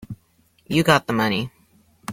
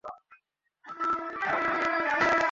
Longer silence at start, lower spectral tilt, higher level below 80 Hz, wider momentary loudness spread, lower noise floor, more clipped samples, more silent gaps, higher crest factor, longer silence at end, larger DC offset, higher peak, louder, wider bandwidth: about the same, 0 s vs 0.05 s; about the same, -5 dB/octave vs -4 dB/octave; first, -52 dBFS vs -64 dBFS; first, 22 LU vs 14 LU; second, -61 dBFS vs -68 dBFS; neither; neither; about the same, 22 dB vs 18 dB; about the same, 0 s vs 0 s; neither; first, -2 dBFS vs -12 dBFS; first, -20 LUFS vs -27 LUFS; first, 16.5 kHz vs 8 kHz